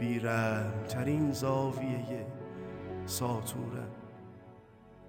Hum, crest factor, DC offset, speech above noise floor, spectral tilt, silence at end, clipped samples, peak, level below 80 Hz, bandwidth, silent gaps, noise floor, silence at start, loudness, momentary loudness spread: none; 16 dB; under 0.1%; 23 dB; -6 dB/octave; 0 s; under 0.1%; -20 dBFS; -64 dBFS; 17 kHz; none; -56 dBFS; 0 s; -34 LUFS; 17 LU